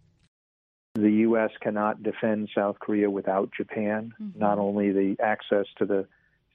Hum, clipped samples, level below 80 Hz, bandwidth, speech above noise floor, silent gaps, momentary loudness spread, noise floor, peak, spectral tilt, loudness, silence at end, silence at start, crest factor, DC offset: none; under 0.1%; -74 dBFS; 3.9 kHz; over 64 dB; none; 7 LU; under -90 dBFS; -10 dBFS; -6 dB/octave; -26 LUFS; 0.5 s; 0.95 s; 18 dB; under 0.1%